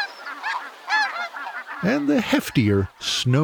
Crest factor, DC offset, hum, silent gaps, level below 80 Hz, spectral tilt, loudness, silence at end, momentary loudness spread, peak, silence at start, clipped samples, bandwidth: 16 dB; under 0.1%; none; none; -54 dBFS; -5 dB/octave; -23 LUFS; 0 s; 10 LU; -6 dBFS; 0 s; under 0.1%; over 20 kHz